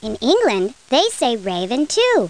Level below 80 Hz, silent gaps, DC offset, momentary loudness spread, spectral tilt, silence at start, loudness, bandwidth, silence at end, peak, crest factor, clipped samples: -52 dBFS; none; 0.3%; 6 LU; -3.5 dB/octave; 0 s; -18 LUFS; 10.5 kHz; 0 s; -4 dBFS; 14 dB; under 0.1%